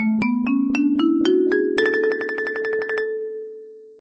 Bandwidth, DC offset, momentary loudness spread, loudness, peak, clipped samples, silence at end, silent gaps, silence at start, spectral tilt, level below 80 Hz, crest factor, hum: 8.4 kHz; under 0.1%; 12 LU; -20 LUFS; -6 dBFS; under 0.1%; 0.1 s; none; 0 s; -6 dB/octave; -62 dBFS; 14 dB; none